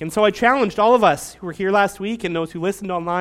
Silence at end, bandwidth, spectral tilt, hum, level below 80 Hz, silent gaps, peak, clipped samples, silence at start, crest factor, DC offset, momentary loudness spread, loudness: 0 s; 16 kHz; -5 dB/octave; none; -52 dBFS; none; -2 dBFS; under 0.1%; 0 s; 18 dB; under 0.1%; 10 LU; -19 LUFS